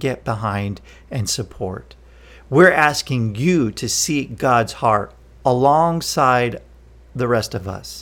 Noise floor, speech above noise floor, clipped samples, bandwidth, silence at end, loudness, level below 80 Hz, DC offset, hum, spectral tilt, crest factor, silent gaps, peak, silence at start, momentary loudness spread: -44 dBFS; 26 dB; under 0.1%; 18 kHz; 0 s; -18 LUFS; -44 dBFS; under 0.1%; none; -4.5 dB/octave; 20 dB; none; 0 dBFS; 0 s; 15 LU